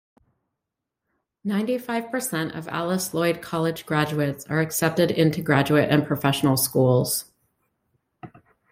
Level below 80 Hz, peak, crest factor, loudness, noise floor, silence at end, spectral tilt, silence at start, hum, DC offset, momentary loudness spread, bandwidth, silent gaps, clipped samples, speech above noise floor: -60 dBFS; -4 dBFS; 20 dB; -23 LUFS; -84 dBFS; 0.45 s; -5 dB/octave; 1.45 s; none; under 0.1%; 8 LU; 16.5 kHz; none; under 0.1%; 62 dB